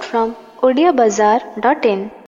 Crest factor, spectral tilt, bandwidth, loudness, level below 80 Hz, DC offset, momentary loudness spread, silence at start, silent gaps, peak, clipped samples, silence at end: 14 dB; -4.5 dB/octave; 7.6 kHz; -15 LUFS; -56 dBFS; under 0.1%; 7 LU; 0 s; none; -2 dBFS; under 0.1%; 0.15 s